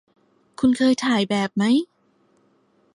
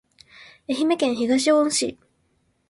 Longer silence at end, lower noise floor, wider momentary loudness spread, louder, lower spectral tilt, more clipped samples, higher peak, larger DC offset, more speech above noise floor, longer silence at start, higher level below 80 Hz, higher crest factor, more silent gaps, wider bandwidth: first, 1.1 s vs 0.75 s; second, -62 dBFS vs -67 dBFS; second, 4 LU vs 11 LU; about the same, -20 LUFS vs -21 LUFS; first, -5 dB/octave vs -2.5 dB/octave; neither; about the same, -8 dBFS vs -8 dBFS; neither; second, 43 dB vs 47 dB; first, 0.6 s vs 0.4 s; about the same, -62 dBFS vs -64 dBFS; about the same, 16 dB vs 16 dB; neither; about the same, 11.5 kHz vs 11.5 kHz